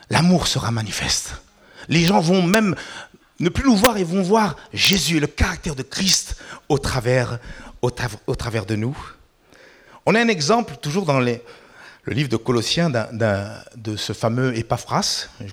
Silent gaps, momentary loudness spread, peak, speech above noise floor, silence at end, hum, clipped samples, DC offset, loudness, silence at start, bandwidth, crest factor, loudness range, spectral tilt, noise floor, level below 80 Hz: none; 14 LU; -2 dBFS; 31 dB; 0 s; none; under 0.1%; under 0.1%; -20 LUFS; 0.1 s; over 20 kHz; 18 dB; 5 LU; -4.5 dB/octave; -51 dBFS; -40 dBFS